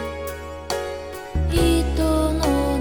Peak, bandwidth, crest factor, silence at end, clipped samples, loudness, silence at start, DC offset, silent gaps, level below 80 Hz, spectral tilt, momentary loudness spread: -6 dBFS; 19 kHz; 14 dB; 0 s; under 0.1%; -23 LUFS; 0 s; 0.3%; none; -26 dBFS; -6 dB/octave; 12 LU